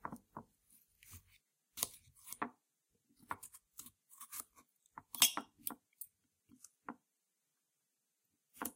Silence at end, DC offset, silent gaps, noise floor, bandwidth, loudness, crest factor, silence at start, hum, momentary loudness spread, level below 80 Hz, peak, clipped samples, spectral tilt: 0.05 s; under 0.1%; none; -86 dBFS; 16.5 kHz; -39 LUFS; 36 dB; 0.05 s; none; 27 LU; -80 dBFS; -10 dBFS; under 0.1%; 0 dB/octave